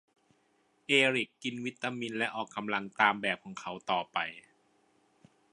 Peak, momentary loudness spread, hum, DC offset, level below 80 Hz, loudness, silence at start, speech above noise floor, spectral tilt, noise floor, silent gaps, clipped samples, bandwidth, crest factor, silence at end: -10 dBFS; 14 LU; none; under 0.1%; -80 dBFS; -31 LUFS; 0.9 s; 39 dB; -3.5 dB/octave; -71 dBFS; none; under 0.1%; 11 kHz; 24 dB; 1.15 s